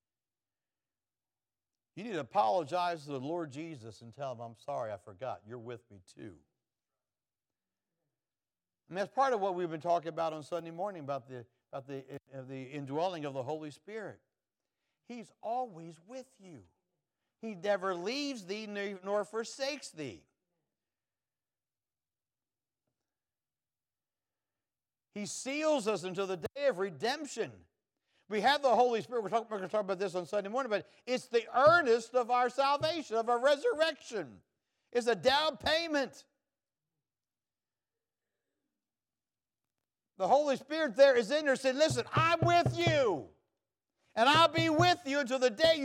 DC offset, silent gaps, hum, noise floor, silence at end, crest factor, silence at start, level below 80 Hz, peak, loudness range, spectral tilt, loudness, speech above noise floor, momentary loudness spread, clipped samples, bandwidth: under 0.1%; none; none; under -90 dBFS; 0 s; 22 dB; 1.95 s; -72 dBFS; -12 dBFS; 15 LU; -4.5 dB/octave; -32 LUFS; over 58 dB; 19 LU; under 0.1%; 15.5 kHz